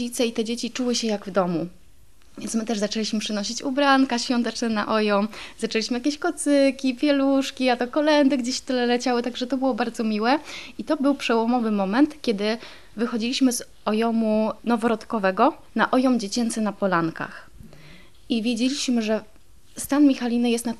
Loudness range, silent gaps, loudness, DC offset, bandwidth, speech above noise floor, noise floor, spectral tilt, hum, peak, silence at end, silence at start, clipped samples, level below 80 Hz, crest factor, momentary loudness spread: 4 LU; none; -23 LUFS; 0.5%; 13.5 kHz; 33 dB; -55 dBFS; -4 dB/octave; none; -6 dBFS; 0.05 s; 0 s; under 0.1%; -58 dBFS; 18 dB; 8 LU